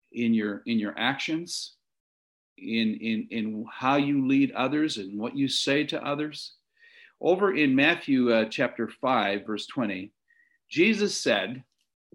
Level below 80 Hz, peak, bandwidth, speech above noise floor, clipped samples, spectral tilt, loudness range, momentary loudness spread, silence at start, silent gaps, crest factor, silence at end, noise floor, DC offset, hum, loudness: -74 dBFS; -8 dBFS; 15.5 kHz; 40 dB; under 0.1%; -4.5 dB/octave; 4 LU; 11 LU; 0.15 s; 2.00-2.56 s; 20 dB; 0.55 s; -66 dBFS; under 0.1%; none; -26 LUFS